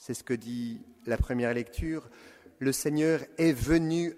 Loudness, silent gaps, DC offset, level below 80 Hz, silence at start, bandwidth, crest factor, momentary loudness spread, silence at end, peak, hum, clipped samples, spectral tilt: -30 LUFS; none; under 0.1%; -42 dBFS; 0 s; 15.5 kHz; 16 dB; 10 LU; 0 s; -12 dBFS; none; under 0.1%; -5.5 dB/octave